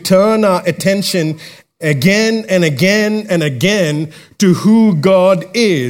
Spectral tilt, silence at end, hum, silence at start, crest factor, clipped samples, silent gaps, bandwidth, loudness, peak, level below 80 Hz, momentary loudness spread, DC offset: -5.5 dB/octave; 0 s; none; 0 s; 12 dB; under 0.1%; none; 17 kHz; -12 LUFS; 0 dBFS; -56 dBFS; 7 LU; under 0.1%